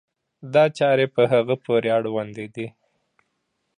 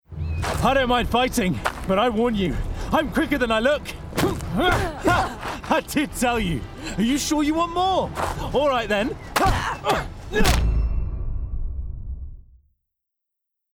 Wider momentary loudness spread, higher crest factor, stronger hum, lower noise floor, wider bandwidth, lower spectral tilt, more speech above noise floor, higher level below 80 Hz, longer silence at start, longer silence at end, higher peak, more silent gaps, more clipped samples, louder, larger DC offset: first, 14 LU vs 11 LU; about the same, 18 dB vs 18 dB; neither; second, -74 dBFS vs -82 dBFS; second, 10 kHz vs over 20 kHz; first, -6.5 dB/octave vs -5 dB/octave; second, 54 dB vs 61 dB; second, -70 dBFS vs -30 dBFS; first, 0.45 s vs 0.1 s; second, 1.1 s vs 1.35 s; about the same, -4 dBFS vs -6 dBFS; neither; neither; first, -20 LUFS vs -23 LUFS; neither